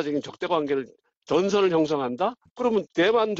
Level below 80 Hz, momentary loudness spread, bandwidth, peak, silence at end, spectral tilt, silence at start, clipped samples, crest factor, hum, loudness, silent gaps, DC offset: -64 dBFS; 8 LU; 7.8 kHz; -10 dBFS; 0 s; -5.5 dB/octave; 0 s; under 0.1%; 14 dB; none; -25 LUFS; 1.17-1.21 s, 2.51-2.56 s; under 0.1%